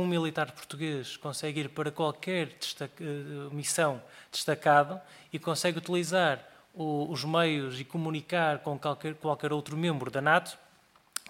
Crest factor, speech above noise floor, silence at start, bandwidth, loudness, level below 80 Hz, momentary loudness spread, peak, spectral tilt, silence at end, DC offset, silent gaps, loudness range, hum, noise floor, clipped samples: 22 dB; 32 dB; 0 s; 16.5 kHz; -31 LUFS; -76 dBFS; 12 LU; -10 dBFS; -4.5 dB/octave; 0.1 s; under 0.1%; none; 4 LU; none; -63 dBFS; under 0.1%